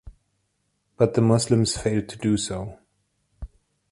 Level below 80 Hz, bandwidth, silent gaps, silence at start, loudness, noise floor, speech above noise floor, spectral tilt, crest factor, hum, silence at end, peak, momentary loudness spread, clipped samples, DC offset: -46 dBFS; 11.5 kHz; none; 0.05 s; -23 LUFS; -73 dBFS; 51 dB; -5.5 dB/octave; 20 dB; 50 Hz at -55 dBFS; 0.45 s; -4 dBFS; 25 LU; under 0.1%; under 0.1%